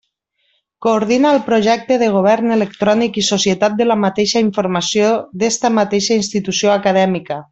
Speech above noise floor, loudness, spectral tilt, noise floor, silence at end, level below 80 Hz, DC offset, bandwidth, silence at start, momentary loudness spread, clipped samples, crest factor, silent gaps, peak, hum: 51 dB; -15 LUFS; -4 dB/octave; -66 dBFS; 0.1 s; -56 dBFS; under 0.1%; 8.2 kHz; 0.8 s; 4 LU; under 0.1%; 12 dB; none; -2 dBFS; none